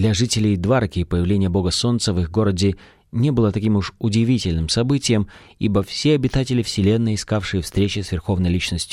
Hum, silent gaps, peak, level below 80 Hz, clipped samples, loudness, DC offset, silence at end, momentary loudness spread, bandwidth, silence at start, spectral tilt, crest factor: none; none; -6 dBFS; -36 dBFS; under 0.1%; -20 LUFS; under 0.1%; 0 s; 4 LU; 14 kHz; 0 s; -5.5 dB/octave; 14 dB